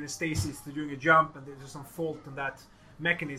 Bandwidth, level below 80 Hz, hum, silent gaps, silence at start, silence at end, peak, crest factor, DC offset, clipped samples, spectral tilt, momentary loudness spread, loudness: 16 kHz; -58 dBFS; none; none; 0 s; 0 s; -8 dBFS; 24 dB; under 0.1%; under 0.1%; -4.5 dB/octave; 20 LU; -29 LUFS